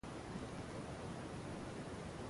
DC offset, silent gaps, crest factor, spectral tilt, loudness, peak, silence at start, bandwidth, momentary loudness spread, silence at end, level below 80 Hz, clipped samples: under 0.1%; none; 12 dB; -5.5 dB/octave; -48 LUFS; -36 dBFS; 0.05 s; 11.5 kHz; 0 LU; 0 s; -60 dBFS; under 0.1%